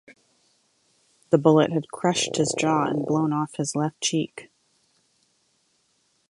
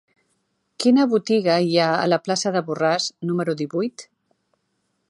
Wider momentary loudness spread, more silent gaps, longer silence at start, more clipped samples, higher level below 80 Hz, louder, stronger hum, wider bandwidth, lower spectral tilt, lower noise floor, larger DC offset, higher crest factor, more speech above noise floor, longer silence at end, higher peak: about the same, 8 LU vs 7 LU; neither; first, 1.3 s vs 0.8 s; neither; first, -68 dBFS vs -74 dBFS; about the same, -23 LUFS vs -21 LUFS; neither; about the same, 11.5 kHz vs 11.5 kHz; about the same, -5 dB/octave vs -5 dB/octave; second, -68 dBFS vs -72 dBFS; neither; first, 22 dB vs 16 dB; second, 46 dB vs 52 dB; first, 1.85 s vs 1.05 s; first, -2 dBFS vs -6 dBFS